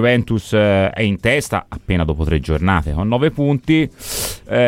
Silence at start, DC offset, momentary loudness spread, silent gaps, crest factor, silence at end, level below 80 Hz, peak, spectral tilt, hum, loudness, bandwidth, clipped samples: 0 s; under 0.1%; 7 LU; none; 14 dB; 0 s; -30 dBFS; -2 dBFS; -6 dB/octave; none; -17 LUFS; 17 kHz; under 0.1%